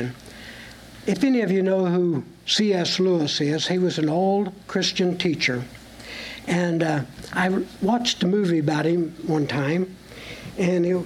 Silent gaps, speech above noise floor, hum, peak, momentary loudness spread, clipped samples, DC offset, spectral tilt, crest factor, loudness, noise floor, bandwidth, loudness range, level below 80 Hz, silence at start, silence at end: none; 20 dB; none; -8 dBFS; 16 LU; under 0.1%; under 0.1%; -5.5 dB/octave; 16 dB; -23 LUFS; -42 dBFS; 14 kHz; 3 LU; -56 dBFS; 0 s; 0 s